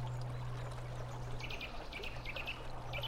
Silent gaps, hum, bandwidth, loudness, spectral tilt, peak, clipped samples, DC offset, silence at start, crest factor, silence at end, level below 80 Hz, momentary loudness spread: none; none; 16 kHz; -44 LUFS; -5 dB/octave; -28 dBFS; under 0.1%; under 0.1%; 0 s; 14 dB; 0 s; -48 dBFS; 3 LU